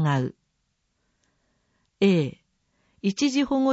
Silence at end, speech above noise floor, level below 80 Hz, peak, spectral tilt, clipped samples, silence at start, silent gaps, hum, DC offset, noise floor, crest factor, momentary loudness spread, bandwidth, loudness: 0 s; 52 dB; -62 dBFS; -10 dBFS; -6 dB/octave; under 0.1%; 0 s; none; none; under 0.1%; -74 dBFS; 16 dB; 10 LU; 8 kHz; -25 LUFS